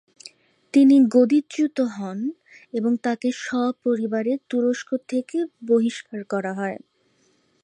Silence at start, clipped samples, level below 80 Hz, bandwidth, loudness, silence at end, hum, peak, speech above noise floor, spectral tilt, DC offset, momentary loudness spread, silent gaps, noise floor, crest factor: 0.25 s; under 0.1%; -78 dBFS; 10.5 kHz; -22 LUFS; 0.85 s; none; -6 dBFS; 43 dB; -6 dB/octave; under 0.1%; 14 LU; none; -64 dBFS; 16 dB